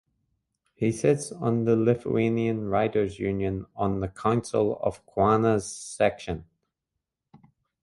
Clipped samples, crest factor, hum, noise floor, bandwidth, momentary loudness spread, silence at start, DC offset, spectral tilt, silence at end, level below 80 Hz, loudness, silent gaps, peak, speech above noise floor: under 0.1%; 20 dB; none; -85 dBFS; 11.5 kHz; 7 LU; 0.8 s; under 0.1%; -6.5 dB/octave; 1.4 s; -52 dBFS; -26 LUFS; none; -8 dBFS; 60 dB